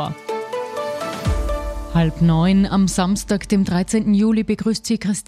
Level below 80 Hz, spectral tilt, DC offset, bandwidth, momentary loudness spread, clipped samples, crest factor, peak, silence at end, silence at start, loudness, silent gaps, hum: -32 dBFS; -6 dB/octave; under 0.1%; 14 kHz; 10 LU; under 0.1%; 12 dB; -6 dBFS; 0.05 s; 0 s; -19 LUFS; none; none